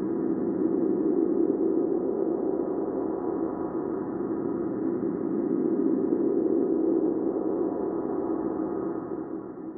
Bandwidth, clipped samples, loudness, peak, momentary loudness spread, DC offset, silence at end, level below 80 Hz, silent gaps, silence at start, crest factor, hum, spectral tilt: 2.2 kHz; under 0.1%; -28 LUFS; -12 dBFS; 6 LU; under 0.1%; 0 s; -62 dBFS; none; 0 s; 14 dB; none; -7.5 dB/octave